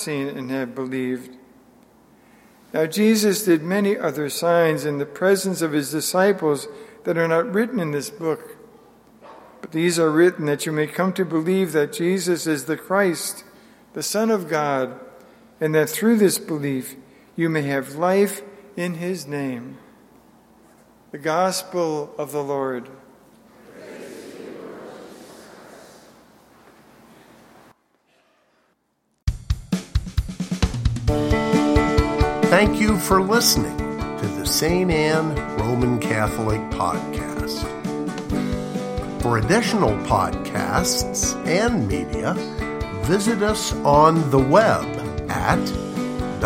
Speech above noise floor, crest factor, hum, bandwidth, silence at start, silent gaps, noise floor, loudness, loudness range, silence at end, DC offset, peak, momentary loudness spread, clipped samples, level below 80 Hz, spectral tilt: 49 dB; 22 dB; none; 16.5 kHz; 0 s; none; -70 dBFS; -21 LUFS; 11 LU; 0 s; under 0.1%; 0 dBFS; 12 LU; under 0.1%; -36 dBFS; -5 dB/octave